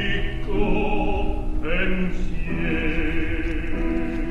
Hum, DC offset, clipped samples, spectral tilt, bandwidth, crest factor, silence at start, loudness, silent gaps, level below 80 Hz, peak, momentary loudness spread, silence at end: none; under 0.1%; under 0.1%; -7.5 dB/octave; 4.4 kHz; 14 dB; 0 s; -26 LUFS; none; -24 dBFS; -8 dBFS; 5 LU; 0 s